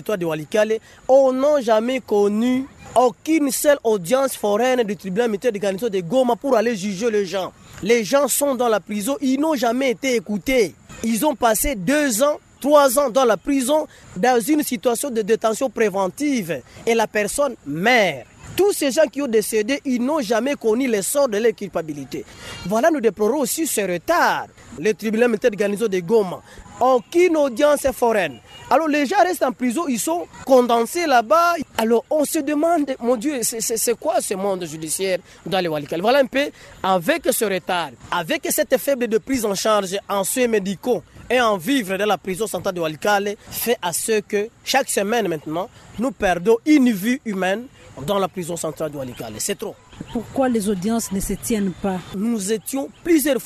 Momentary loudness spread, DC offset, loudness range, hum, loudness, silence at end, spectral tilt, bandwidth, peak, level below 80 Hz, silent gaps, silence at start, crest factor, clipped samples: 9 LU; under 0.1%; 3 LU; none; -20 LUFS; 0 s; -4 dB/octave; 13.5 kHz; -2 dBFS; -48 dBFS; none; 0 s; 18 dB; under 0.1%